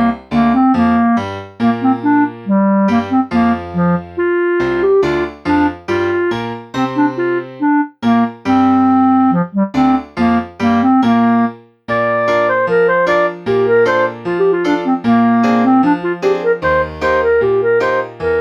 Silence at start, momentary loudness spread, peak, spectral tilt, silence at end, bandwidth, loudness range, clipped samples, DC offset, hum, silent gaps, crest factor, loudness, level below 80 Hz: 0 s; 6 LU; -2 dBFS; -7.5 dB/octave; 0 s; 7.2 kHz; 2 LU; under 0.1%; under 0.1%; none; none; 12 dB; -14 LUFS; -44 dBFS